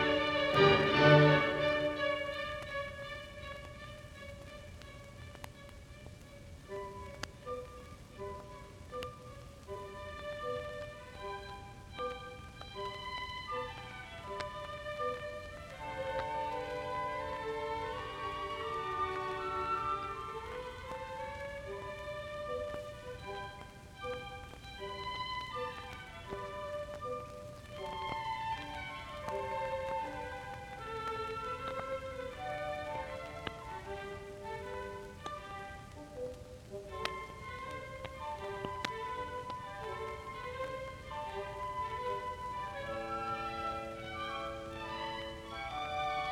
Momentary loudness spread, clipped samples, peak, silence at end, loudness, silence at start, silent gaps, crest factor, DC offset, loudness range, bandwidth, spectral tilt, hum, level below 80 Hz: 13 LU; under 0.1%; -12 dBFS; 0 s; -38 LUFS; 0 s; none; 26 dB; under 0.1%; 8 LU; 16 kHz; -5.5 dB/octave; none; -56 dBFS